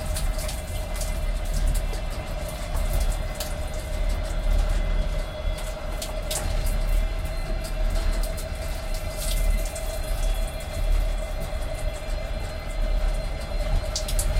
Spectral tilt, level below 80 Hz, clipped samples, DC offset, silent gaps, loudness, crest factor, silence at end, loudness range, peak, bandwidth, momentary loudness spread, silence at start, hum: -4 dB/octave; -26 dBFS; under 0.1%; under 0.1%; none; -30 LUFS; 14 dB; 0 s; 1 LU; -12 dBFS; 16.5 kHz; 5 LU; 0 s; none